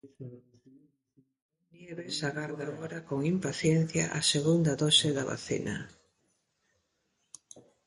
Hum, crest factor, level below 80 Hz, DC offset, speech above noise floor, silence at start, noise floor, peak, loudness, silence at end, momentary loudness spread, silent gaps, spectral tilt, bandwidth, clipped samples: none; 22 dB; -64 dBFS; under 0.1%; 47 dB; 0.05 s; -78 dBFS; -10 dBFS; -29 LUFS; 0.25 s; 24 LU; 1.42-1.49 s; -4 dB/octave; 11.5 kHz; under 0.1%